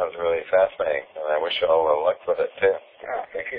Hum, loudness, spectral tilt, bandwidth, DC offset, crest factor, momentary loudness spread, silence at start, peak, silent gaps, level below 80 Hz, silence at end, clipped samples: none; -23 LUFS; -6.5 dB/octave; 5 kHz; under 0.1%; 16 dB; 10 LU; 0 s; -6 dBFS; none; -60 dBFS; 0 s; under 0.1%